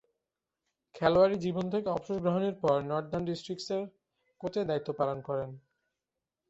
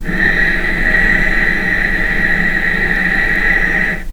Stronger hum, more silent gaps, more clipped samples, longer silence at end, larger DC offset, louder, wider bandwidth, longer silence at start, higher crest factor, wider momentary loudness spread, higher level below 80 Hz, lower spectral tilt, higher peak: neither; neither; neither; first, 0.9 s vs 0 s; neither; second, -31 LUFS vs -12 LUFS; second, 8 kHz vs 17.5 kHz; first, 0.95 s vs 0 s; first, 22 dB vs 14 dB; first, 11 LU vs 2 LU; second, -64 dBFS vs -20 dBFS; first, -7 dB/octave vs -5 dB/octave; second, -10 dBFS vs 0 dBFS